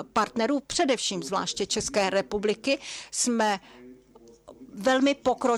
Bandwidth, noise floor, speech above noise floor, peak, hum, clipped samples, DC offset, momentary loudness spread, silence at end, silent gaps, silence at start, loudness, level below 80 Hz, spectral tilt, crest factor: 14 kHz; -54 dBFS; 28 dB; -12 dBFS; none; under 0.1%; under 0.1%; 6 LU; 0 s; none; 0 s; -26 LUFS; -58 dBFS; -3 dB/octave; 16 dB